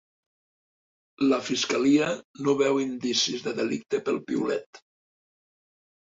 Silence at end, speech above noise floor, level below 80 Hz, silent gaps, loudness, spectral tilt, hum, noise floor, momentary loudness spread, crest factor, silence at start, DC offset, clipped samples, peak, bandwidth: 1.25 s; over 64 dB; -70 dBFS; 2.24-2.34 s, 4.66-4.73 s; -26 LUFS; -3.5 dB/octave; none; under -90 dBFS; 7 LU; 18 dB; 1.2 s; under 0.1%; under 0.1%; -10 dBFS; 7.8 kHz